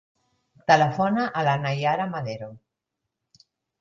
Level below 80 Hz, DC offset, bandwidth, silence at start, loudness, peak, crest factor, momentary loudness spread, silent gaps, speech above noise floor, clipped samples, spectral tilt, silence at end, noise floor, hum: -66 dBFS; under 0.1%; 7.4 kHz; 0.7 s; -23 LUFS; -4 dBFS; 22 dB; 14 LU; none; 60 dB; under 0.1%; -6 dB/octave; 1.25 s; -83 dBFS; none